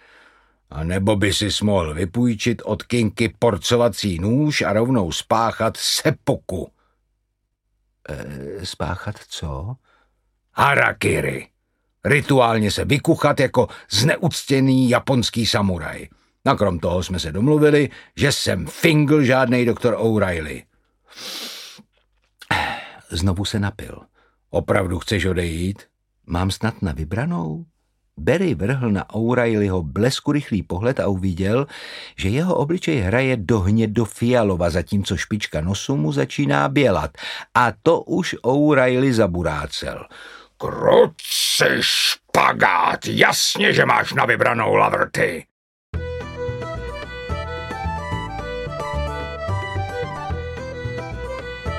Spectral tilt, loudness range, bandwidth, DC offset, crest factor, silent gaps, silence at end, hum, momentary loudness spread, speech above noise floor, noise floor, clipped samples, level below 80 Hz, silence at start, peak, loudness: -5 dB/octave; 10 LU; 16.5 kHz; under 0.1%; 20 dB; 45.51-45.93 s; 0 s; none; 14 LU; 53 dB; -73 dBFS; under 0.1%; -40 dBFS; 0.7 s; 0 dBFS; -20 LUFS